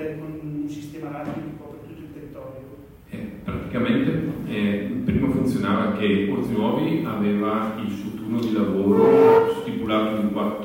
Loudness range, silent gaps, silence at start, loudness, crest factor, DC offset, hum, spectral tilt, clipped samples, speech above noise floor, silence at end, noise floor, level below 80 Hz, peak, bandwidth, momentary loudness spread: 14 LU; none; 0 s; -22 LUFS; 18 dB; under 0.1%; none; -8 dB/octave; under 0.1%; 22 dB; 0 s; -43 dBFS; -48 dBFS; -4 dBFS; 16.5 kHz; 20 LU